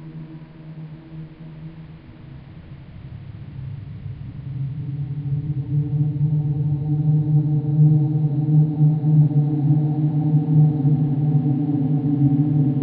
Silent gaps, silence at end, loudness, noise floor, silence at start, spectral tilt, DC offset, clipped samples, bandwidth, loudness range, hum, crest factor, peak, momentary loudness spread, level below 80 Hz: none; 0 s; -19 LUFS; -40 dBFS; 0 s; -12.5 dB/octave; under 0.1%; under 0.1%; 2.3 kHz; 19 LU; none; 14 dB; -6 dBFS; 22 LU; -48 dBFS